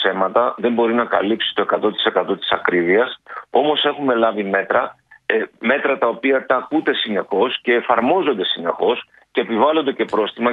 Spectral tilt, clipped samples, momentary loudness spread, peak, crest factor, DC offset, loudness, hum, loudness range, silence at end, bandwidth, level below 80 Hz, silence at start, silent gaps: -6.5 dB/octave; under 0.1%; 5 LU; -2 dBFS; 18 dB; under 0.1%; -18 LUFS; none; 1 LU; 0 s; 5 kHz; -66 dBFS; 0 s; none